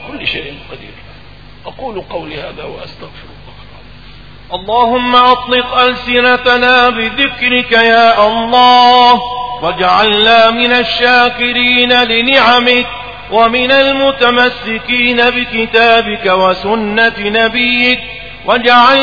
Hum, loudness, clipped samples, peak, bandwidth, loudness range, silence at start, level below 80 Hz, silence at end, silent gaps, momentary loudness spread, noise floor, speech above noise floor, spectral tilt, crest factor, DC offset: 50 Hz at -40 dBFS; -9 LUFS; 0.5%; 0 dBFS; 5.4 kHz; 15 LU; 0 s; -40 dBFS; 0 s; none; 17 LU; -35 dBFS; 25 dB; -4.5 dB/octave; 10 dB; 1%